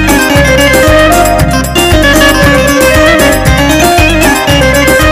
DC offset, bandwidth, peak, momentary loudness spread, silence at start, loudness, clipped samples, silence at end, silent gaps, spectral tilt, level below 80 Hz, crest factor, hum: under 0.1%; 16.5 kHz; 0 dBFS; 3 LU; 0 s; -5 LUFS; 2%; 0 s; none; -4 dB/octave; -16 dBFS; 6 dB; none